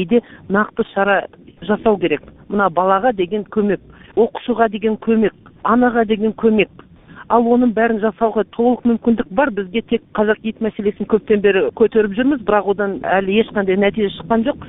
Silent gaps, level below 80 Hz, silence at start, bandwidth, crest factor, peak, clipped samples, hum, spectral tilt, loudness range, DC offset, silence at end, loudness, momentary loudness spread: none; -46 dBFS; 0 s; 4 kHz; 16 dB; 0 dBFS; under 0.1%; none; -11 dB/octave; 2 LU; under 0.1%; 0 s; -17 LUFS; 6 LU